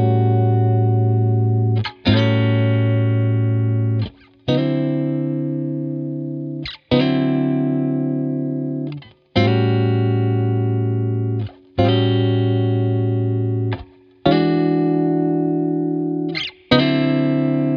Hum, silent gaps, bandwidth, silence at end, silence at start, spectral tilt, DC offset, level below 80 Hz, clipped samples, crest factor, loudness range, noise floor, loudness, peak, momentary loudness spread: none; none; 5.4 kHz; 0 s; 0 s; -9.5 dB/octave; under 0.1%; -48 dBFS; under 0.1%; 18 dB; 3 LU; -39 dBFS; -19 LUFS; 0 dBFS; 9 LU